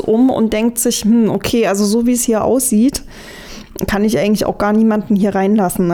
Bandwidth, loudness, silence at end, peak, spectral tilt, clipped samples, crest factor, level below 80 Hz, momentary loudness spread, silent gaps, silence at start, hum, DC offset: 19 kHz; -14 LUFS; 0 s; -4 dBFS; -5 dB/octave; under 0.1%; 10 dB; -38 dBFS; 12 LU; none; 0 s; none; under 0.1%